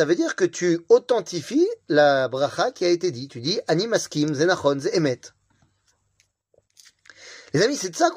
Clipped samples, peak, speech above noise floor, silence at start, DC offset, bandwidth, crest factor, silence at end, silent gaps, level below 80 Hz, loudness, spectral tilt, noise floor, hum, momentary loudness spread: under 0.1%; -4 dBFS; 46 dB; 0 s; under 0.1%; 15.5 kHz; 18 dB; 0 s; none; -68 dBFS; -22 LUFS; -4.5 dB/octave; -68 dBFS; none; 8 LU